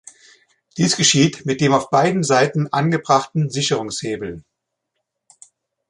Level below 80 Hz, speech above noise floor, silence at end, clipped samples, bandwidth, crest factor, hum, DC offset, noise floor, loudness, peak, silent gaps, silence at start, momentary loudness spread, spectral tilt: -58 dBFS; 59 dB; 1.5 s; under 0.1%; 11.5 kHz; 18 dB; none; under 0.1%; -77 dBFS; -18 LUFS; -2 dBFS; none; 0.75 s; 13 LU; -4 dB/octave